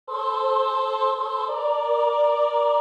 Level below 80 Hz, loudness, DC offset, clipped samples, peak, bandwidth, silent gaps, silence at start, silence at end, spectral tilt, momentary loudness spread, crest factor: -88 dBFS; -23 LUFS; under 0.1%; under 0.1%; -10 dBFS; 8 kHz; none; 0.1 s; 0 s; -0.5 dB/octave; 5 LU; 12 dB